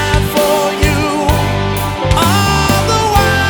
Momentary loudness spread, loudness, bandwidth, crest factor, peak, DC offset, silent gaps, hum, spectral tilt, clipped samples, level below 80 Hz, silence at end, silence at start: 4 LU; -12 LUFS; over 20 kHz; 12 dB; 0 dBFS; under 0.1%; none; none; -4.5 dB/octave; under 0.1%; -22 dBFS; 0 s; 0 s